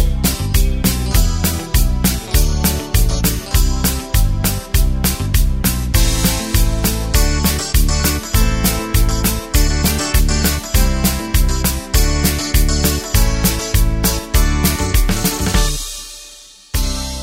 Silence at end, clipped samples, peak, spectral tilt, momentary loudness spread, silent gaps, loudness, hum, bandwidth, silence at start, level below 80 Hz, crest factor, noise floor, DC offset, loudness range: 0 s; under 0.1%; 0 dBFS; -4 dB/octave; 3 LU; none; -16 LUFS; none; 16.5 kHz; 0 s; -16 dBFS; 14 dB; -39 dBFS; under 0.1%; 1 LU